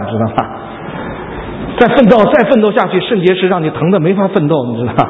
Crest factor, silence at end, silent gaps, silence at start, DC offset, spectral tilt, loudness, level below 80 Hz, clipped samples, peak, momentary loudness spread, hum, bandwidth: 12 dB; 0 s; none; 0 s; under 0.1%; -9 dB/octave; -11 LUFS; -38 dBFS; 0.3%; 0 dBFS; 16 LU; none; 6.4 kHz